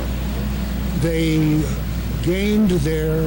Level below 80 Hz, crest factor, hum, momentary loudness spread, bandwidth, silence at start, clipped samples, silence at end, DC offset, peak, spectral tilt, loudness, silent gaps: -26 dBFS; 10 dB; none; 7 LU; 17 kHz; 0 s; under 0.1%; 0 s; under 0.1%; -10 dBFS; -6.5 dB/octave; -20 LUFS; none